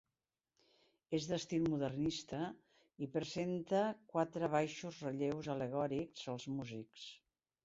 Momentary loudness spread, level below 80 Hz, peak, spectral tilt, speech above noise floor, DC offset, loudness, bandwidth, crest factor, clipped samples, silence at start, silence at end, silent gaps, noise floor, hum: 11 LU; -72 dBFS; -22 dBFS; -5.5 dB/octave; over 50 dB; under 0.1%; -40 LUFS; 7.6 kHz; 20 dB; under 0.1%; 1.1 s; 0.5 s; none; under -90 dBFS; none